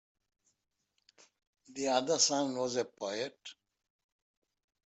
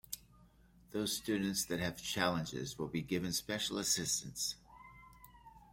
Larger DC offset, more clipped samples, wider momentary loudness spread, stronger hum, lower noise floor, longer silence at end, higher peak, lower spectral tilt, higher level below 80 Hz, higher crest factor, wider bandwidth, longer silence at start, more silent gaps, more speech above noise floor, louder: neither; neither; first, 21 LU vs 16 LU; neither; first, -82 dBFS vs -64 dBFS; first, 1.35 s vs 0.1 s; first, -12 dBFS vs -16 dBFS; about the same, -2 dB/octave vs -3 dB/octave; second, -84 dBFS vs -64 dBFS; about the same, 26 dB vs 24 dB; second, 8.2 kHz vs 16.5 kHz; first, 1.7 s vs 0.1 s; neither; first, 49 dB vs 27 dB; first, -32 LUFS vs -37 LUFS